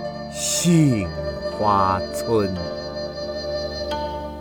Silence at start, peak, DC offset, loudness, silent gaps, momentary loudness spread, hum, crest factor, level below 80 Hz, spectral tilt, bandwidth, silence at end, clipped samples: 0 s; -6 dBFS; under 0.1%; -22 LUFS; none; 12 LU; 50 Hz at -50 dBFS; 16 dB; -40 dBFS; -5 dB/octave; over 20 kHz; 0 s; under 0.1%